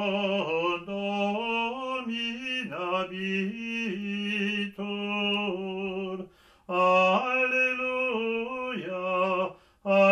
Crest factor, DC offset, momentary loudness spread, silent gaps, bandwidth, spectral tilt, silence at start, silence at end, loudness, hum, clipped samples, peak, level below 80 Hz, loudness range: 18 dB; under 0.1%; 10 LU; none; 10.5 kHz; -5.5 dB/octave; 0 s; 0 s; -28 LUFS; none; under 0.1%; -10 dBFS; -68 dBFS; 4 LU